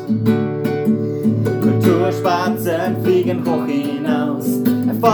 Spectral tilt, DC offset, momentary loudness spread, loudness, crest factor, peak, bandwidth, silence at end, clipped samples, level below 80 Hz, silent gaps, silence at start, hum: -7.5 dB/octave; under 0.1%; 4 LU; -17 LUFS; 16 dB; 0 dBFS; over 20 kHz; 0 s; under 0.1%; -60 dBFS; none; 0 s; none